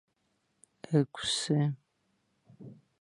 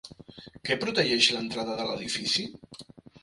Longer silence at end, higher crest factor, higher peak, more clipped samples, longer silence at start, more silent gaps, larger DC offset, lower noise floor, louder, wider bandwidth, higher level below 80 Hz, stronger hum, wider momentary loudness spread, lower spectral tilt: first, 0.3 s vs 0.05 s; about the same, 22 dB vs 26 dB; second, -14 dBFS vs -4 dBFS; neither; first, 0.9 s vs 0.05 s; neither; neither; first, -77 dBFS vs -49 dBFS; second, -30 LUFS vs -26 LUFS; about the same, 11.5 kHz vs 11.5 kHz; second, -70 dBFS vs -62 dBFS; neither; about the same, 23 LU vs 25 LU; first, -5 dB/octave vs -2.5 dB/octave